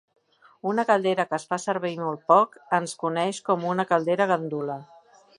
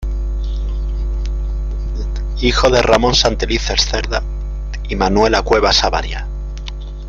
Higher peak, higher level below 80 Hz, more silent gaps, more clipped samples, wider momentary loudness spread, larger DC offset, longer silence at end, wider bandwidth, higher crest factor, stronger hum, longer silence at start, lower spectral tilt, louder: second, -4 dBFS vs 0 dBFS; second, -76 dBFS vs -20 dBFS; neither; neither; second, 10 LU vs 14 LU; neither; first, 0.55 s vs 0 s; first, 11.5 kHz vs 7.4 kHz; about the same, 20 dB vs 16 dB; neither; first, 0.65 s vs 0 s; about the same, -5 dB/octave vs -4 dB/octave; second, -25 LUFS vs -16 LUFS